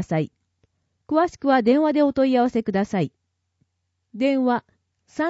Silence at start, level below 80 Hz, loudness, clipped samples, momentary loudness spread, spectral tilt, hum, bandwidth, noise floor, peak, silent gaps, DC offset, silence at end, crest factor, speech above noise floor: 0 s; -60 dBFS; -21 LUFS; under 0.1%; 9 LU; -7 dB/octave; none; 8 kHz; -75 dBFS; -6 dBFS; none; under 0.1%; 0 s; 16 dB; 55 dB